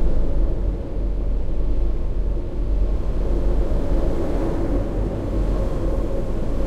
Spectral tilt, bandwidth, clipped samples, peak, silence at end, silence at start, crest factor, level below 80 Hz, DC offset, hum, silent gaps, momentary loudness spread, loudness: -9 dB/octave; 5.2 kHz; under 0.1%; -8 dBFS; 0 s; 0 s; 12 dB; -22 dBFS; under 0.1%; none; none; 3 LU; -25 LUFS